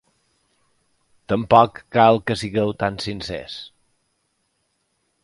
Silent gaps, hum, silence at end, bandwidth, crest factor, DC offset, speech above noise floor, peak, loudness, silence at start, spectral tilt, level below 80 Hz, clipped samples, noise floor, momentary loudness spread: none; none; 1.55 s; 11.5 kHz; 22 dB; under 0.1%; 51 dB; 0 dBFS; -19 LUFS; 1.3 s; -6 dB/octave; -52 dBFS; under 0.1%; -70 dBFS; 17 LU